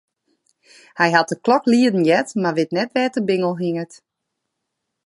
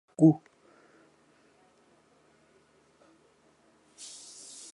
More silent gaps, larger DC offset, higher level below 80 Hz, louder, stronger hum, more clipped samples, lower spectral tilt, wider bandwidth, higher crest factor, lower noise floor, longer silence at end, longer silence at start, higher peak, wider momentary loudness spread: neither; neither; first, -70 dBFS vs -80 dBFS; first, -18 LUFS vs -27 LUFS; neither; neither; second, -5.5 dB/octave vs -7.5 dB/octave; about the same, 11.5 kHz vs 11.5 kHz; about the same, 20 dB vs 24 dB; first, -78 dBFS vs -65 dBFS; second, 1.1 s vs 4.4 s; first, 0.95 s vs 0.2 s; first, -2 dBFS vs -10 dBFS; second, 9 LU vs 22 LU